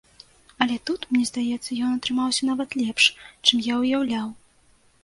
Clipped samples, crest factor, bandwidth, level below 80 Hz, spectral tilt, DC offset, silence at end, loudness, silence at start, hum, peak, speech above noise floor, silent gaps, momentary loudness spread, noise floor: under 0.1%; 24 dB; 11.5 kHz; -62 dBFS; -2 dB/octave; under 0.1%; 0.7 s; -23 LUFS; 0.6 s; none; -2 dBFS; 35 dB; none; 8 LU; -59 dBFS